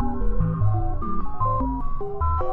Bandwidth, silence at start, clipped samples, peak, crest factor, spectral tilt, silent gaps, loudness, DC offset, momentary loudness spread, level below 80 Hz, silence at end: 2.4 kHz; 0 s; under 0.1%; -10 dBFS; 12 dB; -12 dB/octave; none; -26 LUFS; under 0.1%; 7 LU; -26 dBFS; 0 s